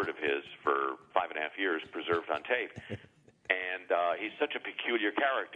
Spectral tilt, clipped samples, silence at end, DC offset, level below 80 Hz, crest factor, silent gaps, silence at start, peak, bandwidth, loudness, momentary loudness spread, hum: -6 dB/octave; under 0.1%; 0.05 s; under 0.1%; -74 dBFS; 24 dB; none; 0 s; -8 dBFS; 9.4 kHz; -32 LUFS; 5 LU; none